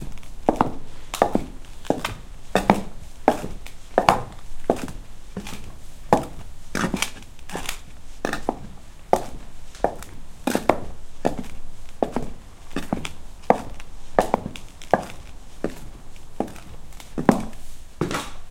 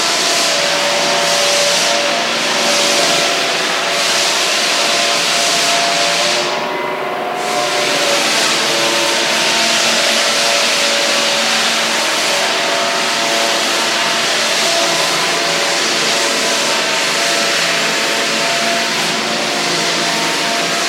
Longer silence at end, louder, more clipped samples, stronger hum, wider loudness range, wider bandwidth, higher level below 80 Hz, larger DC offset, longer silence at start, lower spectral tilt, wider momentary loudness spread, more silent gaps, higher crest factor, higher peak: about the same, 0 s vs 0 s; second, -26 LUFS vs -13 LUFS; neither; neither; about the same, 4 LU vs 2 LU; about the same, 16.5 kHz vs 16.5 kHz; first, -38 dBFS vs -64 dBFS; neither; about the same, 0 s vs 0 s; first, -5 dB/octave vs -0.5 dB/octave; first, 21 LU vs 3 LU; neither; first, 26 dB vs 14 dB; about the same, 0 dBFS vs 0 dBFS